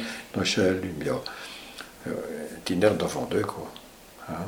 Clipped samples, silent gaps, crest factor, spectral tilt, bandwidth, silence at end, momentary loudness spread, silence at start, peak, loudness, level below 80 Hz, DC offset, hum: under 0.1%; none; 22 dB; -4.5 dB/octave; over 20 kHz; 0 s; 18 LU; 0 s; -8 dBFS; -28 LUFS; -56 dBFS; under 0.1%; none